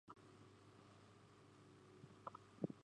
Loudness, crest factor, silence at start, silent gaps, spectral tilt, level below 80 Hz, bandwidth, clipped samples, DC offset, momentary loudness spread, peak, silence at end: -60 LUFS; 30 dB; 0.05 s; none; -7 dB/octave; -84 dBFS; 10.5 kHz; under 0.1%; under 0.1%; 14 LU; -26 dBFS; 0 s